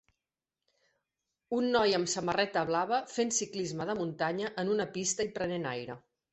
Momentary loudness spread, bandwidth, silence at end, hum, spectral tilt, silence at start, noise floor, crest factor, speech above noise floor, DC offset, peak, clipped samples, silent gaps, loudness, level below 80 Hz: 8 LU; 8.6 kHz; 0.35 s; none; -3.5 dB/octave; 1.5 s; under -90 dBFS; 20 dB; over 58 dB; under 0.1%; -12 dBFS; under 0.1%; none; -32 LUFS; -68 dBFS